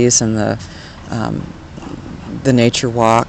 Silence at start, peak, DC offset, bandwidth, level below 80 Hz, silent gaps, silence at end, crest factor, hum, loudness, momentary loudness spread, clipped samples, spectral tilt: 0 s; 0 dBFS; under 0.1%; 9.4 kHz; -40 dBFS; none; 0 s; 16 dB; none; -16 LUFS; 19 LU; 0.3%; -4.5 dB/octave